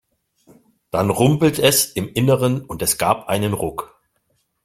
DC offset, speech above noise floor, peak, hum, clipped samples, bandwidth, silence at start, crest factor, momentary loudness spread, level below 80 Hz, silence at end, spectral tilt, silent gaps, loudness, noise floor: under 0.1%; 49 dB; -2 dBFS; none; under 0.1%; 16.5 kHz; 0.95 s; 18 dB; 9 LU; -50 dBFS; 0.8 s; -4.5 dB/octave; none; -18 LUFS; -68 dBFS